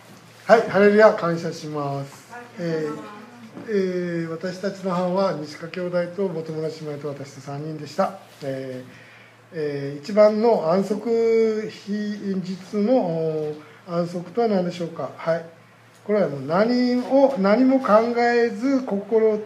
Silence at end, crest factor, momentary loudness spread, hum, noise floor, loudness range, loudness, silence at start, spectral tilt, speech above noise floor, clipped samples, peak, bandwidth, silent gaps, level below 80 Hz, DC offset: 0 s; 22 dB; 16 LU; none; -50 dBFS; 9 LU; -22 LUFS; 0.1 s; -7 dB/octave; 28 dB; under 0.1%; 0 dBFS; 13 kHz; none; -76 dBFS; under 0.1%